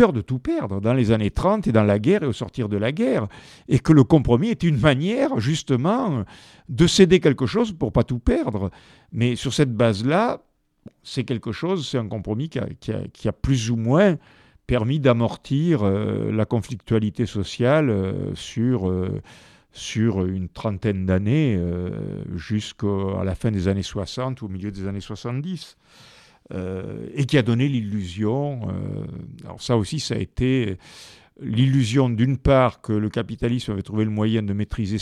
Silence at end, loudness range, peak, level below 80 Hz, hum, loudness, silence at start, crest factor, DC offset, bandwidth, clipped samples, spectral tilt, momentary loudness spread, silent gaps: 0 s; 7 LU; 0 dBFS; -42 dBFS; none; -22 LUFS; 0 s; 22 dB; under 0.1%; 11.5 kHz; under 0.1%; -7 dB/octave; 12 LU; none